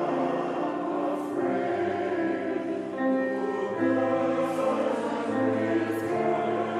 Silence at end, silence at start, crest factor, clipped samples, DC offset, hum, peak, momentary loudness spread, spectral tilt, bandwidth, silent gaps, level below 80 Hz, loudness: 0 s; 0 s; 12 dB; under 0.1%; under 0.1%; none; -14 dBFS; 4 LU; -6.5 dB/octave; 14 kHz; none; -72 dBFS; -28 LUFS